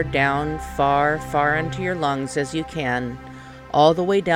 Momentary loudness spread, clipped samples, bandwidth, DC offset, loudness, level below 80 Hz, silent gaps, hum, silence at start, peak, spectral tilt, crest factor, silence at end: 11 LU; under 0.1%; 16.5 kHz; under 0.1%; -21 LUFS; -42 dBFS; none; none; 0 s; -4 dBFS; -5.5 dB/octave; 18 dB; 0 s